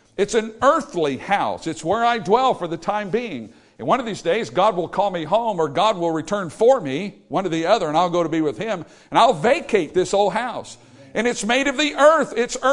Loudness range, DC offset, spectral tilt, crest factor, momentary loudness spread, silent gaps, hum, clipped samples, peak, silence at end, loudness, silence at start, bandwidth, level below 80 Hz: 2 LU; under 0.1%; -4.5 dB/octave; 20 dB; 10 LU; none; none; under 0.1%; 0 dBFS; 0 s; -20 LUFS; 0.2 s; 11 kHz; -54 dBFS